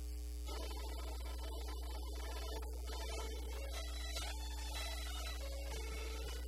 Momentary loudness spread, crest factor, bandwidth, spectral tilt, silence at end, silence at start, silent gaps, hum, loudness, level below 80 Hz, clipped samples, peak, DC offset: 3 LU; 14 dB; 16 kHz; -3.5 dB/octave; 0 s; 0 s; none; none; -45 LUFS; -44 dBFS; under 0.1%; -30 dBFS; under 0.1%